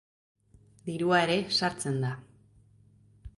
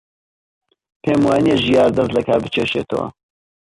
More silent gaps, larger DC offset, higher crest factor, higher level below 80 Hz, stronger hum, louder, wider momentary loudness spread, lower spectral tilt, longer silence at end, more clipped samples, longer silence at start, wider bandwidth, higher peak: neither; neither; first, 20 dB vs 14 dB; second, -60 dBFS vs -48 dBFS; neither; second, -28 LUFS vs -17 LUFS; first, 16 LU vs 10 LU; second, -4.5 dB/octave vs -6.5 dB/octave; second, 0.1 s vs 0.6 s; neither; second, 0.85 s vs 1.05 s; about the same, 11.5 kHz vs 11.5 kHz; second, -12 dBFS vs -4 dBFS